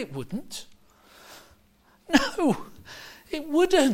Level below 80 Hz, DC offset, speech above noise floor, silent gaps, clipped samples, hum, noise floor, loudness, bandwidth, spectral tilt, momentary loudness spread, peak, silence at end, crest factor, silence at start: -52 dBFS; under 0.1%; 36 dB; none; under 0.1%; none; -61 dBFS; -26 LUFS; 16.5 kHz; -4 dB/octave; 23 LU; -6 dBFS; 0 s; 22 dB; 0 s